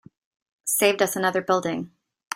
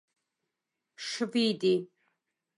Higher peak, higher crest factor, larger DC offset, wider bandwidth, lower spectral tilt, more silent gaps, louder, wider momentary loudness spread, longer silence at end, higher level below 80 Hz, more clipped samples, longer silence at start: first, -4 dBFS vs -16 dBFS; about the same, 20 dB vs 16 dB; neither; first, 16 kHz vs 11.5 kHz; second, -3 dB/octave vs -4.5 dB/octave; first, 2.27-2.31 s vs none; first, -23 LUFS vs -29 LUFS; about the same, 13 LU vs 14 LU; second, 0 s vs 0.75 s; first, -68 dBFS vs -84 dBFS; neither; second, 0.65 s vs 1 s